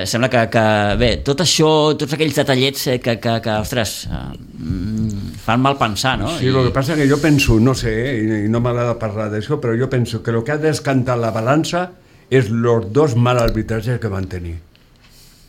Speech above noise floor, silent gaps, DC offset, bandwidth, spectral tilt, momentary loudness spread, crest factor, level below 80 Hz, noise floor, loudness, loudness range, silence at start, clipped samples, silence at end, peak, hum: 31 dB; none; under 0.1%; 16.5 kHz; -5.5 dB/octave; 10 LU; 14 dB; -34 dBFS; -48 dBFS; -17 LUFS; 4 LU; 0 s; under 0.1%; 0.9 s; -2 dBFS; none